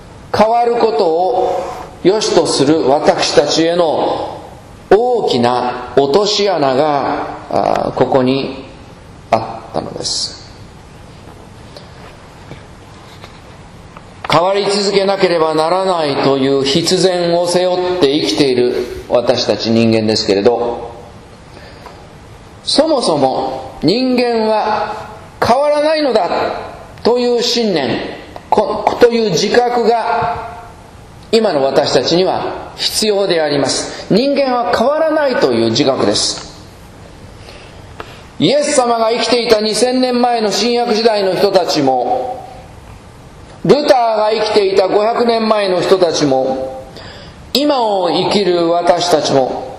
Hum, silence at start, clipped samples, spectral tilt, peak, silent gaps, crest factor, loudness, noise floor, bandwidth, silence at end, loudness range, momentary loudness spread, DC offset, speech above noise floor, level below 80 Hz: none; 0 s; 0.1%; -4 dB/octave; 0 dBFS; none; 14 dB; -13 LUFS; -36 dBFS; 14 kHz; 0 s; 4 LU; 13 LU; under 0.1%; 23 dB; -44 dBFS